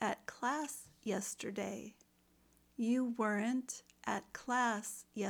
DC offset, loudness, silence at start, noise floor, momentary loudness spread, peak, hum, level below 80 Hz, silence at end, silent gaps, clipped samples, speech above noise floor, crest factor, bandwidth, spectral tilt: under 0.1%; -39 LUFS; 0 s; -71 dBFS; 10 LU; -22 dBFS; none; -78 dBFS; 0 s; none; under 0.1%; 33 dB; 18 dB; 20 kHz; -4 dB/octave